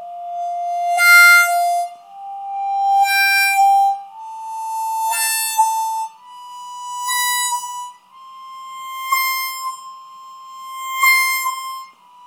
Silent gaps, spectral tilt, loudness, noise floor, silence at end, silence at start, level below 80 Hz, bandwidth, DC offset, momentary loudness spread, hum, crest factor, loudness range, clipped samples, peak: none; 5 dB/octave; -15 LUFS; -41 dBFS; 0.35 s; 0 s; -88 dBFS; 19.5 kHz; under 0.1%; 22 LU; none; 18 dB; 10 LU; under 0.1%; 0 dBFS